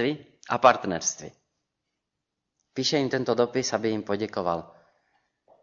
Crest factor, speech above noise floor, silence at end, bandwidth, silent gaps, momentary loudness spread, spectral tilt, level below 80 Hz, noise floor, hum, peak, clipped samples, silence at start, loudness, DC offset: 24 dB; 58 dB; 0.95 s; 7.6 kHz; none; 16 LU; -3.5 dB/octave; -66 dBFS; -83 dBFS; none; -4 dBFS; under 0.1%; 0 s; -26 LUFS; under 0.1%